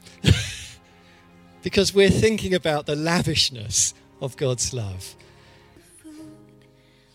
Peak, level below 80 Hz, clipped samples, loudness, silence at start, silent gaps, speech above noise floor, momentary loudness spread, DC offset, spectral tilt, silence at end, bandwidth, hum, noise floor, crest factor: -2 dBFS; -42 dBFS; under 0.1%; -21 LUFS; 0.25 s; none; 33 dB; 21 LU; under 0.1%; -4 dB/octave; 0.8 s; 16 kHz; none; -55 dBFS; 22 dB